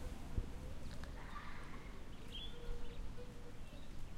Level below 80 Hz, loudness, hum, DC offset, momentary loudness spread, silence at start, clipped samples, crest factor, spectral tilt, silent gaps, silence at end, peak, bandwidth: -48 dBFS; -52 LUFS; none; under 0.1%; 7 LU; 0 s; under 0.1%; 18 dB; -5 dB/octave; none; 0 s; -28 dBFS; 13 kHz